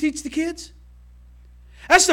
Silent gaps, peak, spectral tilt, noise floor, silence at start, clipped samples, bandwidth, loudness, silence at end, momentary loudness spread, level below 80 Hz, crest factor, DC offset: none; -2 dBFS; -1.5 dB/octave; -47 dBFS; 0 s; under 0.1%; 16.5 kHz; -21 LUFS; 0 s; 25 LU; -46 dBFS; 22 dB; under 0.1%